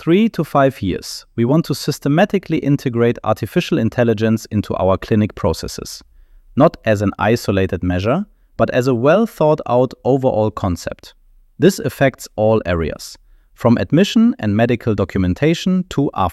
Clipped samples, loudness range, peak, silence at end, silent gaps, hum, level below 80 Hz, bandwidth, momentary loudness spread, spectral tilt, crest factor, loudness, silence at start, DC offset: under 0.1%; 2 LU; 0 dBFS; 0 s; none; none; -42 dBFS; 14.5 kHz; 9 LU; -6.5 dB/octave; 16 dB; -17 LUFS; 0 s; under 0.1%